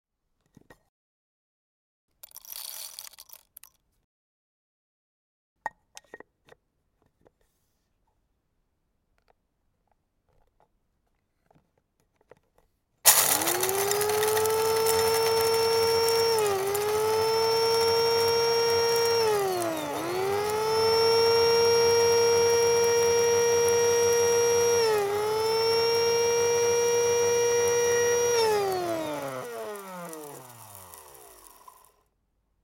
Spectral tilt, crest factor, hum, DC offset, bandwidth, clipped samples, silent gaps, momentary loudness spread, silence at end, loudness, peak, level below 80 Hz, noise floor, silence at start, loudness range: -1.5 dB/octave; 26 dB; none; under 0.1%; 17 kHz; under 0.1%; 4.04-5.56 s; 17 LU; 1.6 s; -23 LUFS; 0 dBFS; -66 dBFS; -75 dBFS; 2.45 s; 21 LU